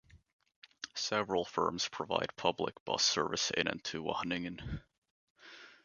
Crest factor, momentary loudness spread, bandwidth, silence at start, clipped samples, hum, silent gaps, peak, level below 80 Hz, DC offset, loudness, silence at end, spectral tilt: 26 dB; 16 LU; 10 kHz; 0.15 s; under 0.1%; none; 0.33-0.39 s, 0.56-0.62 s, 2.80-2.86 s, 4.98-5.02 s, 5.11-5.36 s; -12 dBFS; -60 dBFS; under 0.1%; -35 LUFS; 0.1 s; -2.5 dB/octave